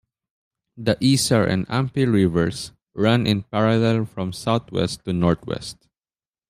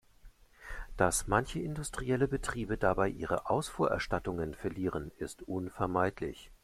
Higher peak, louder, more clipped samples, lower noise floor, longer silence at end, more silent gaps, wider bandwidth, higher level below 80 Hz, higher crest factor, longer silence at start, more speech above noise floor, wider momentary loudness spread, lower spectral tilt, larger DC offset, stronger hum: first, -4 dBFS vs -12 dBFS; first, -21 LUFS vs -34 LUFS; neither; first, under -90 dBFS vs -57 dBFS; first, 0.75 s vs 0.1 s; neither; about the same, 15 kHz vs 15.5 kHz; about the same, -50 dBFS vs -48 dBFS; about the same, 18 dB vs 22 dB; first, 0.75 s vs 0.25 s; first, over 70 dB vs 24 dB; about the same, 10 LU vs 11 LU; about the same, -5.5 dB/octave vs -5 dB/octave; neither; neither